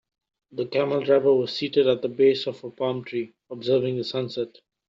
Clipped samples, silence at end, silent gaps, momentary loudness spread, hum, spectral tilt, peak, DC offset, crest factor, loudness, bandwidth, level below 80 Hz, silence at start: under 0.1%; 0.4 s; none; 12 LU; none; -7 dB/octave; -8 dBFS; under 0.1%; 16 dB; -24 LUFS; 7.4 kHz; -70 dBFS; 0.55 s